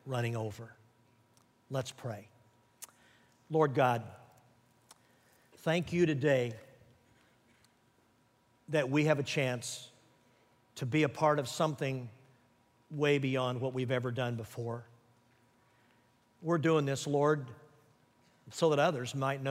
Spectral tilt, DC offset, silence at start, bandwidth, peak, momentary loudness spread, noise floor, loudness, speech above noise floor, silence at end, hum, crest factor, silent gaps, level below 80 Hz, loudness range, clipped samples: -6 dB/octave; under 0.1%; 0.05 s; 16 kHz; -14 dBFS; 19 LU; -70 dBFS; -33 LUFS; 38 dB; 0 s; none; 20 dB; none; -74 dBFS; 4 LU; under 0.1%